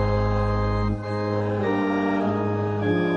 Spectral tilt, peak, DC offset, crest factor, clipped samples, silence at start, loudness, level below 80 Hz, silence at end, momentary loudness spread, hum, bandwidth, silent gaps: -8.5 dB/octave; -10 dBFS; under 0.1%; 12 dB; under 0.1%; 0 s; -24 LUFS; -34 dBFS; 0 s; 3 LU; none; 7 kHz; none